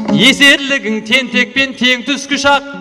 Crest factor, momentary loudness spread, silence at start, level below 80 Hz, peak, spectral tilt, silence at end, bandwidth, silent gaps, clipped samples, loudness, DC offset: 12 dB; 9 LU; 0 s; -48 dBFS; 0 dBFS; -3 dB/octave; 0 s; 16.5 kHz; none; under 0.1%; -10 LUFS; under 0.1%